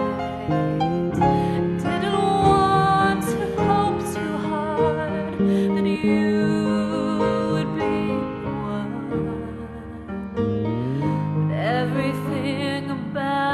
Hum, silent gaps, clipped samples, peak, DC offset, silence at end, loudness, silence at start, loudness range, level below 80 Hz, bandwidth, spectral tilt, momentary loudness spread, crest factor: none; none; under 0.1%; -6 dBFS; under 0.1%; 0 s; -22 LUFS; 0 s; 6 LU; -46 dBFS; 13.5 kHz; -7 dB/octave; 9 LU; 16 dB